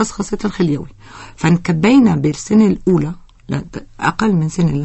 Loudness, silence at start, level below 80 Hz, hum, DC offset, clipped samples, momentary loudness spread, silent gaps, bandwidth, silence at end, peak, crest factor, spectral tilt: -16 LUFS; 0 s; -42 dBFS; none; under 0.1%; under 0.1%; 13 LU; none; 8.6 kHz; 0 s; 0 dBFS; 14 dB; -6.5 dB/octave